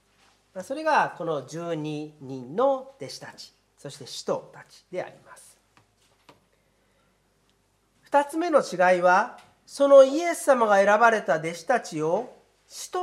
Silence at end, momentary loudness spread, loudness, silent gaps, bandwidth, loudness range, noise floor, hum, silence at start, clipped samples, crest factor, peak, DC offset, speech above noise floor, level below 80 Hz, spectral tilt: 0 s; 23 LU; -23 LUFS; none; 13.5 kHz; 18 LU; -67 dBFS; none; 0.55 s; under 0.1%; 22 dB; -4 dBFS; under 0.1%; 43 dB; -76 dBFS; -4.5 dB/octave